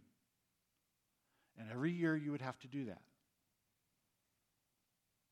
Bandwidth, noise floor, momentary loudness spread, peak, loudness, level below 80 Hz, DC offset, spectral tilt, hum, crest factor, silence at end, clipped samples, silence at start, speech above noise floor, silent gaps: 10 kHz; -85 dBFS; 15 LU; -26 dBFS; -42 LUFS; under -90 dBFS; under 0.1%; -7.5 dB/octave; none; 22 dB; 2.35 s; under 0.1%; 1.55 s; 44 dB; none